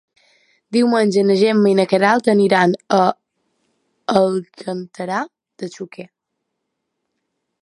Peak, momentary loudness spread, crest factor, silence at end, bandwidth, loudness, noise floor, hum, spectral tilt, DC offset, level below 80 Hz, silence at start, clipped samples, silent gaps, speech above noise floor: 0 dBFS; 18 LU; 18 dB; 1.55 s; 11.5 kHz; -16 LUFS; -77 dBFS; none; -6 dB/octave; under 0.1%; -66 dBFS; 0.7 s; under 0.1%; none; 60 dB